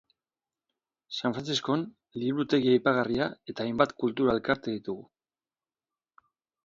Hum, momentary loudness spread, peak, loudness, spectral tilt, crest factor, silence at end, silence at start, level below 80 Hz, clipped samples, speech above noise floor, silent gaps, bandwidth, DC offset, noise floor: none; 12 LU; -6 dBFS; -28 LUFS; -5.5 dB/octave; 24 dB; 1.65 s; 1.1 s; -64 dBFS; under 0.1%; over 62 dB; none; 7.6 kHz; under 0.1%; under -90 dBFS